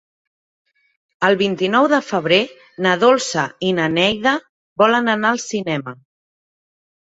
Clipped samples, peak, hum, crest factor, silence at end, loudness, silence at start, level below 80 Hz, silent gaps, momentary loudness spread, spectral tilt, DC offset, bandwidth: under 0.1%; -2 dBFS; none; 18 dB; 1.2 s; -17 LUFS; 1.2 s; -60 dBFS; 4.49-4.76 s; 10 LU; -4 dB/octave; under 0.1%; 8.2 kHz